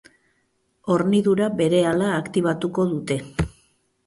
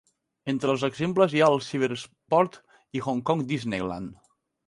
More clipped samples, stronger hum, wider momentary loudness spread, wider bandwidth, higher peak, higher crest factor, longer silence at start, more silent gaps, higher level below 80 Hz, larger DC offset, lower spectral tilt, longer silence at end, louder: neither; neither; second, 9 LU vs 14 LU; about the same, 11.5 kHz vs 11.5 kHz; about the same, -6 dBFS vs -6 dBFS; about the same, 16 dB vs 20 dB; first, 0.85 s vs 0.45 s; neither; first, -44 dBFS vs -62 dBFS; neither; about the same, -6.5 dB/octave vs -6 dB/octave; about the same, 0.55 s vs 0.55 s; first, -22 LUFS vs -26 LUFS